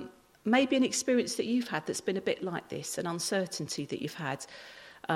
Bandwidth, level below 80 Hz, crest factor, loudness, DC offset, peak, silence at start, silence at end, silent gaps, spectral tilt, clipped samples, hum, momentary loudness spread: 15.5 kHz; -74 dBFS; 18 dB; -31 LUFS; under 0.1%; -14 dBFS; 0 s; 0 s; none; -4 dB/octave; under 0.1%; none; 14 LU